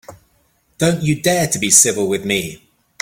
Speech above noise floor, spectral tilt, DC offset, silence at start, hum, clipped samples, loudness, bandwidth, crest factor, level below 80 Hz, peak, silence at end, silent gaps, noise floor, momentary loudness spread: 44 dB; -3 dB/octave; under 0.1%; 0.1 s; none; under 0.1%; -15 LUFS; 17 kHz; 18 dB; -50 dBFS; 0 dBFS; 0.45 s; none; -60 dBFS; 10 LU